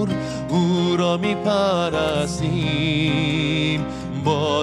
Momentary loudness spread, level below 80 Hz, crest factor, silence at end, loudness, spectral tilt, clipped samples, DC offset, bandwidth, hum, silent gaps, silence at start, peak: 5 LU; -44 dBFS; 14 dB; 0 s; -21 LUFS; -6 dB/octave; under 0.1%; under 0.1%; 12 kHz; none; none; 0 s; -6 dBFS